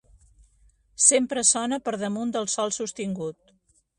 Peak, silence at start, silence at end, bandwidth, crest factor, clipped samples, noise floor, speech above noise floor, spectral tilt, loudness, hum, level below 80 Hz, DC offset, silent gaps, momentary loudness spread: -2 dBFS; 1 s; 0.65 s; 11.5 kHz; 24 dB; under 0.1%; -65 dBFS; 40 dB; -2.5 dB/octave; -23 LUFS; none; -62 dBFS; under 0.1%; none; 13 LU